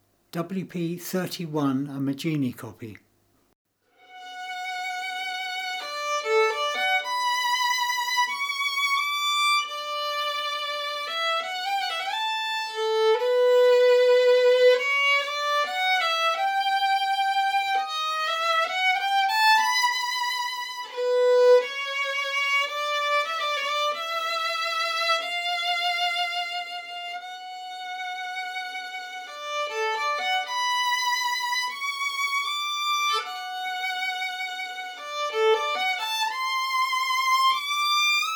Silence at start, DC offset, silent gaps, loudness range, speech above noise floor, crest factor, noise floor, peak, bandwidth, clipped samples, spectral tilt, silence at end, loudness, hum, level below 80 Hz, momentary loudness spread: 0.35 s; under 0.1%; 3.55-3.65 s; 10 LU; 37 dB; 16 dB; -65 dBFS; -10 dBFS; over 20 kHz; under 0.1%; -2.5 dB/octave; 0 s; -24 LUFS; none; -84 dBFS; 12 LU